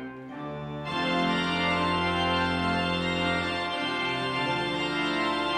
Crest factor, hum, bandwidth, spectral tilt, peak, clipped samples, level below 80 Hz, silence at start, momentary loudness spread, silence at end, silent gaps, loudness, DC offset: 14 dB; none; 11 kHz; -5 dB/octave; -14 dBFS; under 0.1%; -52 dBFS; 0 s; 10 LU; 0 s; none; -27 LUFS; under 0.1%